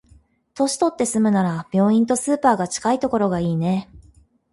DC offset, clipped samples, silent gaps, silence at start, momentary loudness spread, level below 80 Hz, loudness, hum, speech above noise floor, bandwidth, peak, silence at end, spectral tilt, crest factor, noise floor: under 0.1%; under 0.1%; none; 0.55 s; 5 LU; -54 dBFS; -20 LUFS; none; 35 dB; 12 kHz; -4 dBFS; 0.55 s; -5.5 dB/octave; 18 dB; -54 dBFS